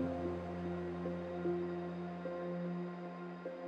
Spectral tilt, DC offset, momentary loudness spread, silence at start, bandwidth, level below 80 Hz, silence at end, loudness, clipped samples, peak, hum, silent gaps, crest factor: -9 dB/octave; under 0.1%; 7 LU; 0 s; 6.6 kHz; -66 dBFS; 0 s; -42 LUFS; under 0.1%; -26 dBFS; none; none; 14 dB